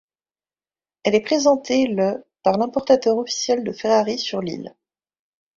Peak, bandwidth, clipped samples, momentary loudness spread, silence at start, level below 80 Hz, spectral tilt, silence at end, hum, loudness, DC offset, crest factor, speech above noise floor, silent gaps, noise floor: -4 dBFS; 7.8 kHz; under 0.1%; 9 LU; 1.05 s; -62 dBFS; -4 dB/octave; 0.9 s; none; -20 LUFS; under 0.1%; 18 dB; over 71 dB; none; under -90 dBFS